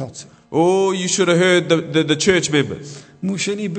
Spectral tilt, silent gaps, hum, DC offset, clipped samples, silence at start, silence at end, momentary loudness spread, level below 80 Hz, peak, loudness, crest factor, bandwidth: -4 dB/octave; none; none; under 0.1%; under 0.1%; 0 s; 0 s; 16 LU; -56 dBFS; 0 dBFS; -17 LUFS; 16 dB; 9.2 kHz